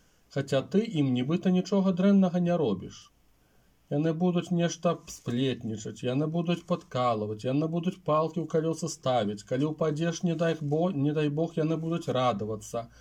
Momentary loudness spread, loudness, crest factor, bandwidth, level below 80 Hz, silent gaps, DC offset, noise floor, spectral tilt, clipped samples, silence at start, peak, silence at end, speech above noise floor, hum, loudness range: 8 LU; -29 LUFS; 16 dB; 12 kHz; -66 dBFS; none; under 0.1%; -64 dBFS; -6.5 dB/octave; under 0.1%; 0.35 s; -12 dBFS; 0.15 s; 37 dB; none; 3 LU